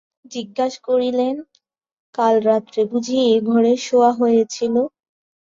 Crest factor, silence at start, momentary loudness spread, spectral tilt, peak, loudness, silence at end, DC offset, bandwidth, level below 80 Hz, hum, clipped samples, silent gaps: 16 dB; 0.3 s; 12 LU; -5 dB/octave; -2 dBFS; -18 LUFS; 0.7 s; under 0.1%; 7.6 kHz; -66 dBFS; none; under 0.1%; 1.92-2.13 s